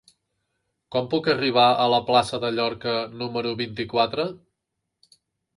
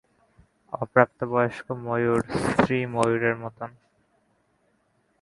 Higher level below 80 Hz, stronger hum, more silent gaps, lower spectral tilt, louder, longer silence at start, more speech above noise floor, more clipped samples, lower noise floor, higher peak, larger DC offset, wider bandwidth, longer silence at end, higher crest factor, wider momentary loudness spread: second, -60 dBFS vs -54 dBFS; neither; neither; second, -5 dB/octave vs -6.5 dB/octave; about the same, -23 LUFS vs -24 LUFS; first, 0.9 s vs 0.7 s; first, 58 dB vs 44 dB; neither; first, -81 dBFS vs -68 dBFS; second, -6 dBFS vs 0 dBFS; neither; about the same, 11.5 kHz vs 11.5 kHz; second, 1.2 s vs 1.55 s; second, 20 dB vs 26 dB; second, 11 LU vs 15 LU